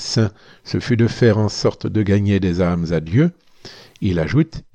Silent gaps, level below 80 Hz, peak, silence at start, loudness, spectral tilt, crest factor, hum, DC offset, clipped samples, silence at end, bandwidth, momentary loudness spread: none; -42 dBFS; -4 dBFS; 0 s; -18 LUFS; -6.5 dB/octave; 16 dB; none; under 0.1%; under 0.1%; 0.15 s; 9 kHz; 7 LU